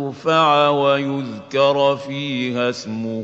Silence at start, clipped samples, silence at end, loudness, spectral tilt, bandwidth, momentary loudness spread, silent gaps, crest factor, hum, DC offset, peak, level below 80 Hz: 0 s; under 0.1%; 0 s; -18 LUFS; -5.5 dB/octave; 8 kHz; 10 LU; none; 16 dB; none; under 0.1%; -2 dBFS; -66 dBFS